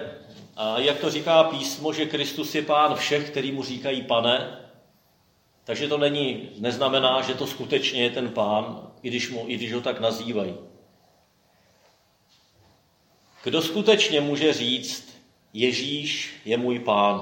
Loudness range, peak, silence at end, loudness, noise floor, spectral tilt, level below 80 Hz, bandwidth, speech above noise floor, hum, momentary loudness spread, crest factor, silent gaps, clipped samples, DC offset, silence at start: 8 LU; -2 dBFS; 0 s; -24 LUFS; -63 dBFS; -4 dB/octave; -72 dBFS; 17 kHz; 39 dB; none; 13 LU; 22 dB; none; under 0.1%; under 0.1%; 0 s